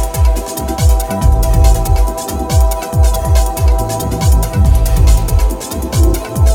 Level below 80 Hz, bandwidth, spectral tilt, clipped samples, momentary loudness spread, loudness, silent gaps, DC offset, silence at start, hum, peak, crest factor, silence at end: -12 dBFS; 17.5 kHz; -5.5 dB/octave; under 0.1%; 6 LU; -14 LUFS; none; under 0.1%; 0 s; none; 0 dBFS; 10 dB; 0 s